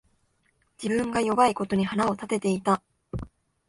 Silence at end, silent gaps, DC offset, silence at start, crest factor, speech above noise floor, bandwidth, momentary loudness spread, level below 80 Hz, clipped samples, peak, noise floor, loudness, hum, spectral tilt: 0.45 s; none; under 0.1%; 0.8 s; 20 dB; 45 dB; 11.5 kHz; 16 LU; -52 dBFS; under 0.1%; -8 dBFS; -69 dBFS; -26 LUFS; none; -5.5 dB/octave